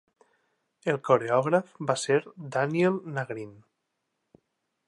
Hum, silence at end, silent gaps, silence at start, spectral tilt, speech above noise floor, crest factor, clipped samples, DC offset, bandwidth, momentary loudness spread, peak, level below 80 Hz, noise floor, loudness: none; 1.35 s; none; 0.85 s; -5.5 dB/octave; 54 dB; 22 dB; under 0.1%; under 0.1%; 11.5 kHz; 11 LU; -8 dBFS; -78 dBFS; -80 dBFS; -27 LUFS